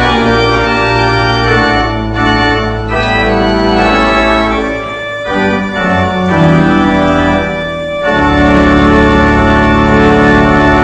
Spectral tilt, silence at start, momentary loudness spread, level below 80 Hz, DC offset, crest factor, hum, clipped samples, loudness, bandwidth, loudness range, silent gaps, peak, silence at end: -6.5 dB/octave; 0 s; 7 LU; -22 dBFS; under 0.1%; 8 dB; none; 0.4%; -9 LUFS; 8.6 kHz; 3 LU; none; 0 dBFS; 0 s